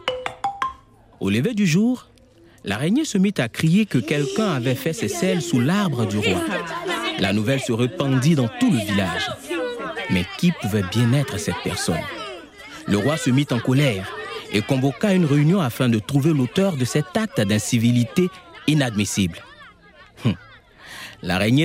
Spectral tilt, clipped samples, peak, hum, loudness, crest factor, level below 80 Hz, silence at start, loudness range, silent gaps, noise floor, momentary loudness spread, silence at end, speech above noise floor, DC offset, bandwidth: -5.5 dB/octave; under 0.1%; -4 dBFS; none; -21 LUFS; 16 dB; -56 dBFS; 0.05 s; 3 LU; none; -51 dBFS; 9 LU; 0 s; 31 dB; under 0.1%; 16 kHz